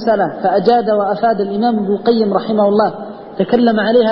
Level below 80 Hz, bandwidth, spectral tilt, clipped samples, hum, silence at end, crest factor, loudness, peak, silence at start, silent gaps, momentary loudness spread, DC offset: -54 dBFS; 5.8 kHz; -9 dB/octave; under 0.1%; none; 0 s; 14 dB; -14 LUFS; 0 dBFS; 0 s; none; 5 LU; under 0.1%